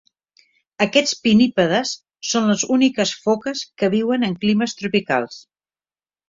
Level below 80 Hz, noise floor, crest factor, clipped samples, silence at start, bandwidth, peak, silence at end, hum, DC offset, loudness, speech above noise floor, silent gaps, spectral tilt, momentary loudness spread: -60 dBFS; under -90 dBFS; 18 dB; under 0.1%; 0.8 s; 7.6 kHz; -2 dBFS; 0.9 s; none; under 0.1%; -19 LUFS; over 71 dB; none; -4 dB/octave; 7 LU